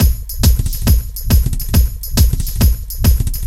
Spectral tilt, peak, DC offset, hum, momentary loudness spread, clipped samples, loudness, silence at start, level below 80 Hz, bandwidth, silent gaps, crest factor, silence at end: -5 dB/octave; 0 dBFS; under 0.1%; none; 2 LU; under 0.1%; -16 LUFS; 0 s; -14 dBFS; 16.5 kHz; none; 14 dB; 0 s